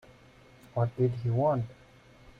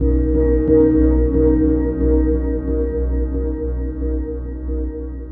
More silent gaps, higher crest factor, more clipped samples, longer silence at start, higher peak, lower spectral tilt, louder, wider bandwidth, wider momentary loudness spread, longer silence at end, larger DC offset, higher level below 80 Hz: neither; about the same, 16 dB vs 14 dB; neither; first, 0.75 s vs 0 s; second, -16 dBFS vs -2 dBFS; second, -10 dB/octave vs -14 dB/octave; second, -30 LUFS vs -18 LUFS; first, 6 kHz vs 2 kHz; about the same, 10 LU vs 11 LU; first, 0.65 s vs 0 s; neither; second, -60 dBFS vs -20 dBFS